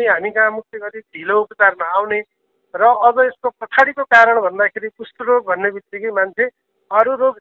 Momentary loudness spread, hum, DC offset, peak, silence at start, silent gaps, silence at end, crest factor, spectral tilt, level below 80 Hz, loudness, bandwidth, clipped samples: 16 LU; none; under 0.1%; 0 dBFS; 0 s; none; 0.1 s; 16 dB; -4.5 dB/octave; -64 dBFS; -16 LUFS; 7.6 kHz; under 0.1%